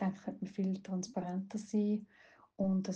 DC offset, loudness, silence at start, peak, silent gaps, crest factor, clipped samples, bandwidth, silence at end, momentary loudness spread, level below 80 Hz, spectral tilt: under 0.1%; -38 LUFS; 0 s; -24 dBFS; none; 14 dB; under 0.1%; 8.4 kHz; 0 s; 6 LU; -72 dBFS; -7 dB/octave